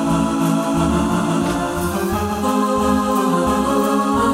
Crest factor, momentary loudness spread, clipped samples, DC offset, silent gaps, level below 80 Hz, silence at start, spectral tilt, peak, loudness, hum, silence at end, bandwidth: 12 dB; 3 LU; under 0.1%; under 0.1%; none; -36 dBFS; 0 s; -5.5 dB/octave; -4 dBFS; -18 LUFS; none; 0 s; 16.5 kHz